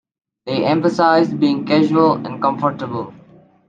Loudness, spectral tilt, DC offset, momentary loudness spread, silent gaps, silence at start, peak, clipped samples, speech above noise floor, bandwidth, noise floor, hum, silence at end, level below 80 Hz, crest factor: -17 LUFS; -7 dB/octave; under 0.1%; 12 LU; none; 0.45 s; -2 dBFS; under 0.1%; 31 dB; 7.6 kHz; -47 dBFS; none; 0.55 s; -62 dBFS; 16 dB